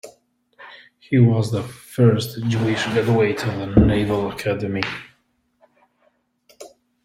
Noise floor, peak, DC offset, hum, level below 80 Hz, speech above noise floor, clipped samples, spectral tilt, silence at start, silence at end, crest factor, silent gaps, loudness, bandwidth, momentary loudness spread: -65 dBFS; -2 dBFS; under 0.1%; none; -38 dBFS; 47 dB; under 0.1%; -7 dB/octave; 0.05 s; 0.35 s; 20 dB; none; -20 LUFS; 16 kHz; 11 LU